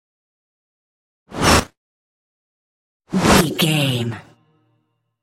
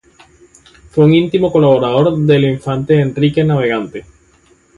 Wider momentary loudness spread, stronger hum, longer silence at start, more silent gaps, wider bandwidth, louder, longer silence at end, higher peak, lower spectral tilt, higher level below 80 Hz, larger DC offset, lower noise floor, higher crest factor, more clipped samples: first, 20 LU vs 10 LU; neither; first, 1.3 s vs 0.95 s; first, 1.77-3.00 s vs none; first, 16.5 kHz vs 10 kHz; second, -17 LUFS vs -13 LUFS; first, 1 s vs 0.75 s; about the same, 0 dBFS vs 0 dBFS; second, -4 dB/octave vs -8.5 dB/octave; first, -38 dBFS vs -46 dBFS; neither; first, -68 dBFS vs -51 dBFS; first, 22 dB vs 14 dB; neither